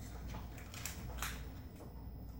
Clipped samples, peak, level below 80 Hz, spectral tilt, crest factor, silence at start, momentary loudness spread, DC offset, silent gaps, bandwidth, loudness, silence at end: under 0.1%; -24 dBFS; -50 dBFS; -4 dB/octave; 22 dB; 0 s; 8 LU; under 0.1%; none; 16.5 kHz; -47 LUFS; 0 s